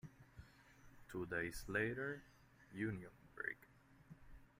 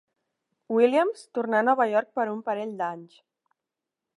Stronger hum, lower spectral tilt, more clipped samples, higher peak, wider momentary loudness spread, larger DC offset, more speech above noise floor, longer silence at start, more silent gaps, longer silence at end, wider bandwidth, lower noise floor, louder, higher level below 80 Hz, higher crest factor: neither; about the same, -6 dB/octave vs -6 dB/octave; neither; second, -26 dBFS vs -8 dBFS; first, 23 LU vs 10 LU; neither; second, 20 dB vs 62 dB; second, 0.05 s vs 0.7 s; neither; second, 0.15 s vs 1.1 s; first, 16 kHz vs 11 kHz; second, -65 dBFS vs -87 dBFS; second, -46 LUFS vs -25 LUFS; first, -66 dBFS vs -84 dBFS; about the same, 22 dB vs 18 dB